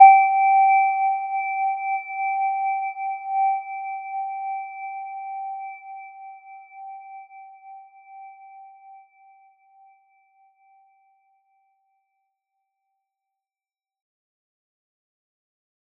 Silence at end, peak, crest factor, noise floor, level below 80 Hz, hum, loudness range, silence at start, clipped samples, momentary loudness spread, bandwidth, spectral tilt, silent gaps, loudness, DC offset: 7.05 s; -2 dBFS; 24 dB; under -90 dBFS; under -90 dBFS; none; 25 LU; 0 s; under 0.1%; 27 LU; 2.5 kHz; 3.5 dB/octave; none; -22 LUFS; under 0.1%